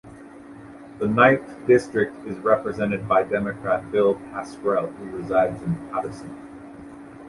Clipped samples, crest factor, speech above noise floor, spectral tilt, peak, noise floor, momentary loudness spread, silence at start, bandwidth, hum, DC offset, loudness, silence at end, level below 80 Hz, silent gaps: under 0.1%; 22 dB; 20 dB; -7 dB/octave; -2 dBFS; -42 dBFS; 23 LU; 0.05 s; 11.5 kHz; none; under 0.1%; -22 LUFS; 0 s; -54 dBFS; none